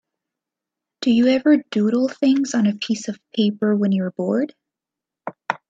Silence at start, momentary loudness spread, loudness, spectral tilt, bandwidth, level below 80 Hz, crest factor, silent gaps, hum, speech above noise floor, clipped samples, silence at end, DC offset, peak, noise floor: 1 s; 12 LU; -20 LUFS; -6 dB/octave; 7.8 kHz; -68 dBFS; 20 dB; none; none; 68 dB; under 0.1%; 0.15 s; under 0.1%; 0 dBFS; -87 dBFS